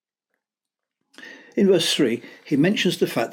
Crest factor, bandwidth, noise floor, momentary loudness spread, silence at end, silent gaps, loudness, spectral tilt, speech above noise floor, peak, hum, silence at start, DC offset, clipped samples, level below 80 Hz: 16 dB; 17 kHz; -87 dBFS; 9 LU; 0 s; none; -21 LUFS; -4.5 dB/octave; 66 dB; -8 dBFS; none; 1.2 s; under 0.1%; under 0.1%; -74 dBFS